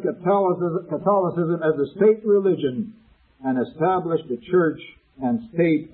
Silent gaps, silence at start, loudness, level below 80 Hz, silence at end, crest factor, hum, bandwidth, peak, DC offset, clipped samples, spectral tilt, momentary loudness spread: none; 0 s; -22 LUFS; -62 dBFS; 0.05 s; 14 dB; none; 4.2 kHz; -6 dBFS; under 0.1%; under 0.1%; -12.5 dB/octave; 8 LU